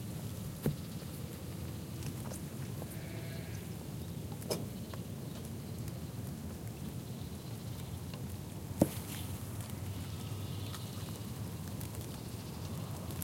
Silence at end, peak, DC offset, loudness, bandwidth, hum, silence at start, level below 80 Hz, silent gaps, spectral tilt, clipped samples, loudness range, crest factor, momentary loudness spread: 0 s; -12 dBFS; under 0.1%; -42 LUFS; 17 kHz; none; 0 s; -58 dBFS; none; -5.5 dB/octave; under 0.1%; 4 LU; 28 dB; 5 LU